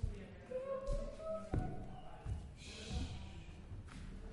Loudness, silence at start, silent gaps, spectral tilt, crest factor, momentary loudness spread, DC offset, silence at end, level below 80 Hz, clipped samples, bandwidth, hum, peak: -47 LUFS; 0 s; none; -6.5 dB/octave; 20 dB; 10 LU; under 0.1%; 0 s; -48 dBFS; under 0.1%; 11.5 kHz; none; -24 dBFS